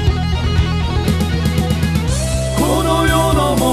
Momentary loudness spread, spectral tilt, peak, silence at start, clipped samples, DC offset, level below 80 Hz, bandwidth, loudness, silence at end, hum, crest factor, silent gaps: 4 LU; -5.5 dB/octave; 0 dBFS; 0 s; under 0.1%; under 0.1%; -22 dBFS; 14 kHz; -16 LUFS; 0 s; none; 14 dB; none